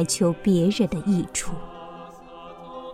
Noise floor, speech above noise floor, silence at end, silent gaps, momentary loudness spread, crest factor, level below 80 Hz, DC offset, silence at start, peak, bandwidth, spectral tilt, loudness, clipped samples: -42 dBFS; 20 dB; 0 s; none; 21 LU; 16 dB; -46 dBFS; under 0.1%; 0 s; -8 dBFS; 15.5 kHz; -5.5 dB/octave; -23 LUFS; under 0.1%